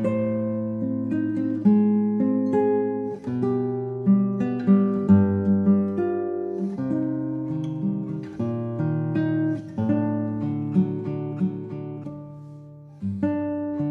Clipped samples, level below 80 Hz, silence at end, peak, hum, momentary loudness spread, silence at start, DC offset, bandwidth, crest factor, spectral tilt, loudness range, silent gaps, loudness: under 0.1%; -64 dBFS; 0 s; -6 dBFS; none; 11 LU; 0 s; under 0.1%; 4 kHz; 16 dB; -11 dB/octave; 6 LU; none; -24 LUFS